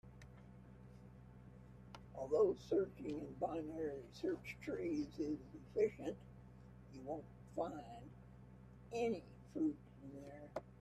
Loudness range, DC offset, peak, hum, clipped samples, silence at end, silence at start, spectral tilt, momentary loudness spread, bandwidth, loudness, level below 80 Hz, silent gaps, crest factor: 5 LU; under 0.1%; -24 dBFS; none; under 0.1%; 0 s; 0.05 s; -7 dB/octave; 21 LU; 13 kHz; -43 LUFS; -66 dBFS; none; 20 dB